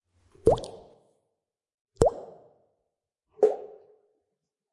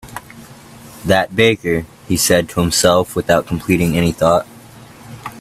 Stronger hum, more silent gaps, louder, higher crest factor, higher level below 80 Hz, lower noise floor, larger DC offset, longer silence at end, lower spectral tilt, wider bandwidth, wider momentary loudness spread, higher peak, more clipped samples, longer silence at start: neither; first, 1.74-1.85 s vs none; second, -27 LUFS vs -15 LUFS; first, 28 dB vs 16 dB; second, -48 dBFS vs -42 dBFS; first, -84 dBFS vs -39 dBFS; neither; first, 1.05 s vs 0 s; first, -6.5 dB/octave vs -4.5 dB/octave; second, 11.5 kHz vs 16 kHz; about the same, 20 LU vs 19 LU; second, -4 dBFS vs 0 dBFS; neither; first, 0.45 s vs 0.05 s